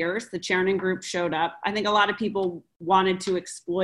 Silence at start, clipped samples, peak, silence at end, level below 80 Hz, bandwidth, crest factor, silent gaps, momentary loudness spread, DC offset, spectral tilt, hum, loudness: 0 s; under 0.1%; -8 dBFS; 0 s; -64 dBFS; 12 kHz; 18 dB; 2.76-2.80 s; 9 LU; under 0.1%; -4.5 dB/octave; none; -25 LUFS